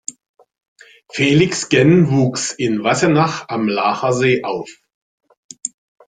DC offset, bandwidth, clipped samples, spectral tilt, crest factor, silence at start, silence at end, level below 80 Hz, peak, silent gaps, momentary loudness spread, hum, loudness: under 0.1%; 9.6 kHz; under 0.1%; -5 dB/octave; 16 dB; 0.1 s; 0.4 s; -54 dBFS; -2 dBFS; 0.29-0.34 s, 0.68-0.76 s, 4.94-5.18 s, 5.37-5.49 s; 16 LU; none; -16 LUFS